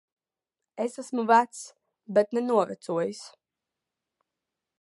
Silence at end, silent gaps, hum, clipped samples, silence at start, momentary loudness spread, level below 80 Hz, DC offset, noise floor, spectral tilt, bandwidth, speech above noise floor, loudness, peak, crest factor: 1.55 s; none; none; under 0.1%; 0.75 s; 21 LU; -84 dBFS; under 0.1%; -89 dBFS; -5 dB/octave; 11.5 kHz; 63 dB; -26 LUFS; -6 dBFS; 22 dB